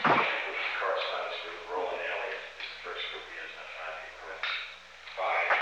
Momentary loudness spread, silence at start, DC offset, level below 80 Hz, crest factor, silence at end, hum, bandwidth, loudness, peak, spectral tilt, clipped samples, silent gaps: 12 LU; 0 s; under 0.1%; -68 dBFS; 20 dB; 0 s; 60 Hz at -70 dBFS; 10.5 kHz; -33 LUFS; -14 dBFS; -3.5 dB/octave; under 0.1%; none